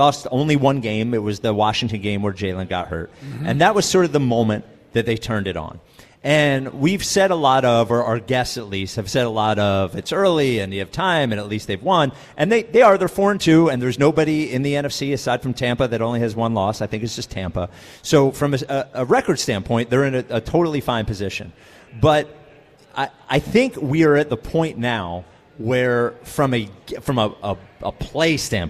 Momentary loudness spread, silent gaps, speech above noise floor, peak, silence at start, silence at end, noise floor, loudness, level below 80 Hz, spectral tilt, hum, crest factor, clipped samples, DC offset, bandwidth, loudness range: 11 LU; none; 29 dB; -2 dBFS; 0 s; 0 s; -48 dBFS; -19 LUFS; -44 dBFS; -5.5 dB/octave; none; 16 dB; under 0.1%; under 0.1%; 15 kHz; 5 LU